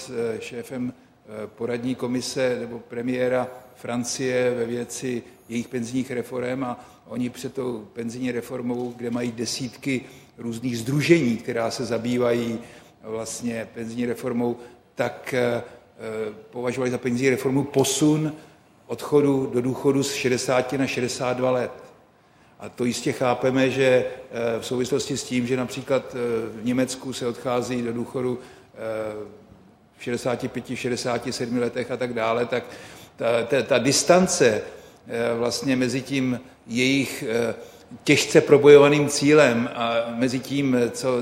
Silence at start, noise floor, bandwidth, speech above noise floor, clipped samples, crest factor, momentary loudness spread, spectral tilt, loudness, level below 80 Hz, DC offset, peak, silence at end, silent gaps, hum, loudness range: 0 s; -56 dBFS; 16 kHz; 32 dB; under 0.1%; 22 dB; 14 LU; -4.5 dB/octave; -24 LUFS; -60 dBFS; under 0.1%; 0 dBFS; 0 s; none; none; 11 LU